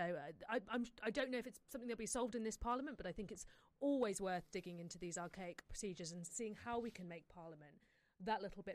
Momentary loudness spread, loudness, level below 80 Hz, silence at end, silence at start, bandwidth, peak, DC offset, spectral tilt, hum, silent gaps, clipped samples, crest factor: 12 LU; -46 LUFS; -66 dBFS; 0 s; 0 s; 15 kHz; -28 dBFS; under 0.1%; -4 dB/octave; none; none; under 0.1%; 16 dB